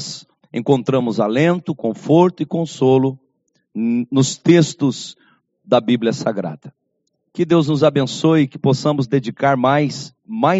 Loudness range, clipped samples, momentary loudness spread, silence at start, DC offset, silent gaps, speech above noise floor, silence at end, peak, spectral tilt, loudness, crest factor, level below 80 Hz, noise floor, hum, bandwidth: 2 LU; under 0.1%; 15 LU; 0 s; under 0.1%; none; 54 dB; 0 s; 0 dBFS; -6 dB/octave; -17 LUFS; 18 dB; -60 dBFS; -70 dBFS; none; 8 kHz